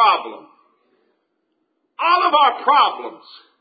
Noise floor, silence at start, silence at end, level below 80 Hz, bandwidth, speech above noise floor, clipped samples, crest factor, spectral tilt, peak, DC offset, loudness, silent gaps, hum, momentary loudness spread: -70 dBFS; 0 s; 0.45 s; -86 dBFS; 5 kHz; 53 dB; under 0.1%; 18 dB; -5.5 dB/octave; -2 dBFS; under 0.1%; -16 LUFS; none; none; 19 LU